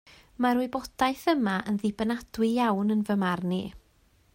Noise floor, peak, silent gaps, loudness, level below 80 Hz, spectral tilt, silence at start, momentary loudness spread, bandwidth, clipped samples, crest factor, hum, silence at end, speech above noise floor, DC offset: -63 dBFS; -12 dBFS; none; -27 LUFS; -58 dBFS; -6 dB/octave; 0.4 s; 6 LU; 16 kHz; under 0.1%; 16 dB; none; 0.55 s; 37 dB; under 0.1%